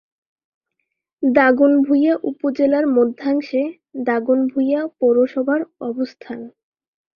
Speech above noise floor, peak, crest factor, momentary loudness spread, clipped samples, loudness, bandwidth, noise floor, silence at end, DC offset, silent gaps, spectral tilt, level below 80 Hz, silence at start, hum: 59 dB; 0 dBFS; 18 dB; 12 LU; under 0.1%; -18 LUFS; 5.8 kHz; -76 dBFS; 0.7 s; under 0.1%; none; -7.5 dB/octave; -64 dBFS; 1.2 s; none